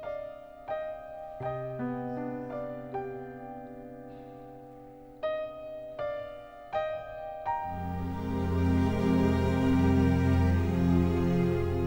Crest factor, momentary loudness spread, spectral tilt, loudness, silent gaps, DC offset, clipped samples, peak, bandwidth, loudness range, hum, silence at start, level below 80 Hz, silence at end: 16 dB; 20 LU; -8.5 dB/octave; -30 LUFS; none; under 0.1%; under 0.1%; -14 dBFS; 16.5 kHz; 13 LU; none; 0 s; -44 dBFS; 0 s